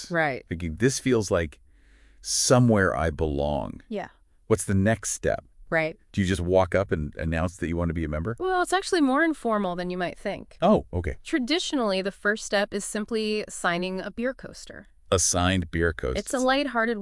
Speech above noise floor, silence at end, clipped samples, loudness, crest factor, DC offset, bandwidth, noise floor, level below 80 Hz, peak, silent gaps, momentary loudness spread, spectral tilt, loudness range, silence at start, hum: 30 dB; 0 s; under 0.1%; -25 LUFS; 20 dB; under 0.1%; 12 kHz; -55 dBFS; -44 dBFS; -6 dBFS; none; 10 LU; -4.5 dB/octave; 3 LU; 0 s; none